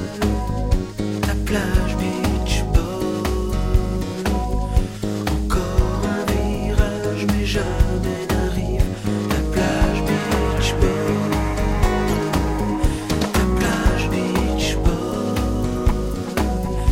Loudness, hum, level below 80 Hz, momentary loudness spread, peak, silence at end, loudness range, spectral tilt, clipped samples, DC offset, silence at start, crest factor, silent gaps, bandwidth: -21 LUFS; none; -24 dBFS; 4 LU; -2 dBFS; 0 s; 2 LU; -6 dB/octave; under 0.1%; 0.2%; 0 s; 18 dB; none; 16 kHz